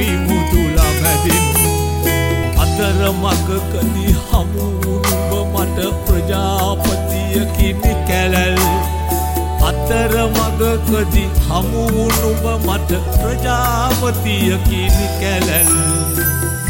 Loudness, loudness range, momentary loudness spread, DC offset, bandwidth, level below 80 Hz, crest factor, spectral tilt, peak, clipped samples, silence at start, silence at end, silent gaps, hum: -15 LUFS; 2 LU; 4 LU; under 0.1%; 17 kHz; -20 dBFS; 14 dB; -4.5 dB/octave; -2 dBFS; under 0.1%; 0 s; 0 s; none; none